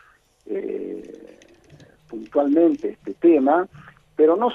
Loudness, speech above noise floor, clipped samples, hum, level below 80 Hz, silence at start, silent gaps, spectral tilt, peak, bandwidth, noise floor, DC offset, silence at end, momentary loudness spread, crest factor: -20 LUFS; 32 dB; under 0.1%; none; -64 dBFS; 0.5 s; none; -7.5 dB/octave; -6 dBFS; 6.2 kHz; -50 dBFS; under 0.1%; 0 s; 19 LU; 16 dB